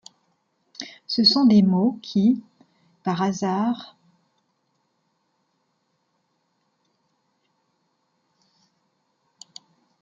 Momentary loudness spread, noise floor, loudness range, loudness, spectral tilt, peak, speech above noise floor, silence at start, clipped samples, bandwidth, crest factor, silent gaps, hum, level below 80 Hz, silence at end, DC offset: 21 LU; -72 dBFS; 11 LU; -21 LUFS; -6 dB/octave; -4 dBFS; 52 dB; 0.8 s; under 0.1%; 7.4 kHz; 22 dB; none; none; -68 dBFS; 6.15 s; under 0.1%